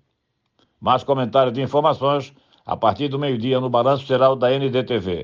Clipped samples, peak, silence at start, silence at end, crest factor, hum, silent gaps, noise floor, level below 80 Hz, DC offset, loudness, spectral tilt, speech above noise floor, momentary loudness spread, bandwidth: under 0.1%; -4 dBFS; 0.8 s; 0 s; 16 dB; none; none; -73 dBFS; -62 dBFS; under 0.1%; -20 LUFS; -7.5 dB/octave; 54 dB; 6 LU; 7.2 kHz